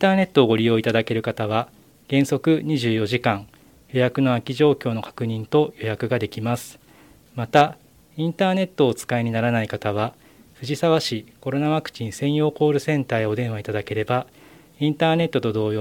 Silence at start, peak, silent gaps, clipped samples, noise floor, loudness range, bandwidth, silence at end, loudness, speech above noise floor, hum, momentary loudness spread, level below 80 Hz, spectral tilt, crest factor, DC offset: 0 s; 0 dBFS; none; under 0.1%; -51 dBFS; 2 LU; 17 kHz; 0 s; -22 LUFS; 30 dB; none; 9 LU; -60 dBFS; -6.5 dB/octave; 22 dB; under 0.1%